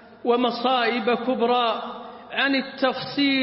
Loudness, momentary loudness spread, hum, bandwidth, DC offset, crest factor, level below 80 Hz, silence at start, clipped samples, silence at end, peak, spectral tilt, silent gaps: -23 LUFS; 9 LU; none; 5.8 kHz; under 0.1%; 16 dB; -70 dBFS; 0 s; under 0.1%; 0 s; -8 dBFS; -8.5 dB/octave; none